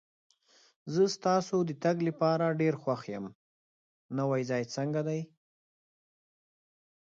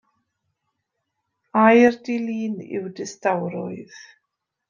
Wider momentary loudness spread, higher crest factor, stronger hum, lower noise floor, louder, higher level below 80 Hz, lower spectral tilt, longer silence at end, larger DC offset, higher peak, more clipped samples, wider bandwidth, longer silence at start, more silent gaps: second, 12 LU vs 18 LU; about the same, 18 dB vs 20 dB; neither; first, under -90 dBFS vs -78 dBFS; second, -31 LUFS vs -21 LUFS; second, -78 dBFS vs -68 dBFS; about the same, -6.5 dB/octave vs -6 dB/octave; first, 1.75 s vs 0.65 s; neither; second, -14 dBFS vs -2 dBFS; neither; about the same, 7.8 kHz vs 7.4 kHz; second, 0.85 s vs 1.55 s; first, 3.35-4.09 s vs none